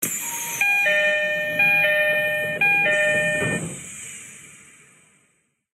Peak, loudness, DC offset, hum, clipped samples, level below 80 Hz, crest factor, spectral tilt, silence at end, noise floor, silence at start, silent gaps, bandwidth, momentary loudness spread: -8 dBFS; -19 LUFS; under 0.1%; none; under 0.1%; -64 dBFS; 14 dB; -2 dB/octave; 1.15 s; -67 dBFS; 0 s; none; 16 kHz; 17 LU